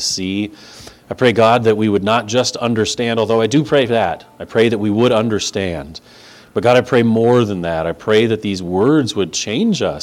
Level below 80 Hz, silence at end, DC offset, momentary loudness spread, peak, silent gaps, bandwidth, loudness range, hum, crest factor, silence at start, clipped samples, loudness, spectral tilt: -48 dBFS; 0 s; under 0.1%; 10 LU; 0 dBFS; none; 15 kHz; 2 LU; none; 16 dB; 0 s; under 0.1%; -15 LUFS; -5 dB/octave